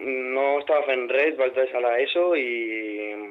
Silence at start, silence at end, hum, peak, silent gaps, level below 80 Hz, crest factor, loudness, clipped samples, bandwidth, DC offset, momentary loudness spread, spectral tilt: 0 s; 0 s; none; -10 dBFS; none; -78 dBFS; 14 dB; -23 LUFS; under 0.1%; 4.8 kHz; under 0.1%; 7 LU; -4.5 dB/octave